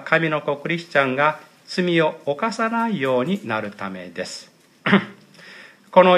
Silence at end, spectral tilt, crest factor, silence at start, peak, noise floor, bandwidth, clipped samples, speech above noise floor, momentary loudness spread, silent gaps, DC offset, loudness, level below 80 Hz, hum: 0 s; -6 dB/octave; 22 dB; 0 s; 0 dBFS; -44 dBFS; 13 kHz; under 0.1%; 23 dB; 13 LU; none; under 0.1%; -21 LUFS; -72 dBFS; none